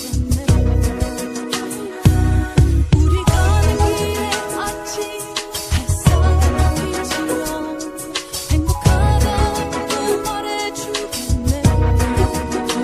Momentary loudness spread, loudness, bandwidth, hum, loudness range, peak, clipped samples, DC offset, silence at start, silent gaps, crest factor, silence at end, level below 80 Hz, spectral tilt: 9 LU; -18 LUFS; 15 kHz; none; 2 LU; 0 dBFS; under 0.1%; under 0.1%; 0 s; none; 16 dB; 0 s; -22 dBFS; -5.5 dB/octave